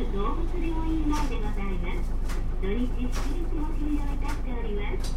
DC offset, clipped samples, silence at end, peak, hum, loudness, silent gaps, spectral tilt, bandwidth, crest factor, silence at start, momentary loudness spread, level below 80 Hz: 0.1%; under 0.1%; 0 s; -14 dBFS; none; -31 LUFS; none; -6.5 dB/octave; 10.5 kHz; 10 dB; 0 s; 4 LU; -26 dBFS